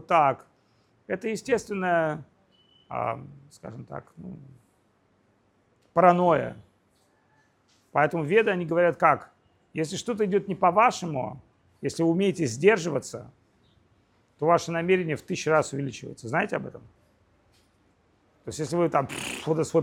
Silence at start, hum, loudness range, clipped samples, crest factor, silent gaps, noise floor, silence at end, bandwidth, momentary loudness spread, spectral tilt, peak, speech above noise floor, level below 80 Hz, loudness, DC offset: 0.1 s; none; 7 LU; under 0.1%; 24 dB; none; -66 dBFS; 0 s; 16 kHz; 18 LU; -5.5 dB/octave; -4 dBFS; 41 dB; -66 dBFS; -25 LUFS; under 0.1%